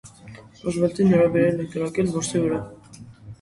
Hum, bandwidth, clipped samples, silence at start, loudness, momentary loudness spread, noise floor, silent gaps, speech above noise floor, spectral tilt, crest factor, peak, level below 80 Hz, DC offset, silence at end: none; 11.5 kHz; under 0.1%; 0.05 s; -22 LUFS; 18 LU; -44 dBFS; none; 23 dB; -6.5 dB/octave; 16 dB; -6 dBFS; -54 dBFS; under 0.1%; 0.1 s